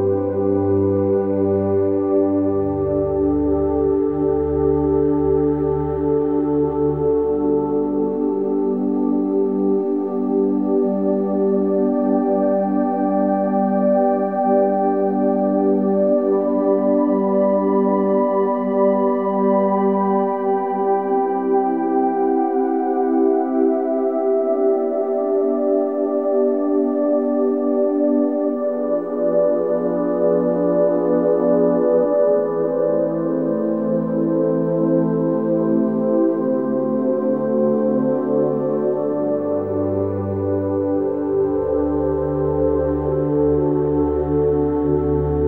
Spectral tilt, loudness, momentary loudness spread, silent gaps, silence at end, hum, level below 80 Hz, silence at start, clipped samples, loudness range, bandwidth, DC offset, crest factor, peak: -12.5 dB/octave; -19 LUFS; 3 LU; none; 0 s; none; -40 dBFS; 0 s; under 0.1%; 2 LU; 3.1 kHz; 0.3%; 12 dB; -6 dBFS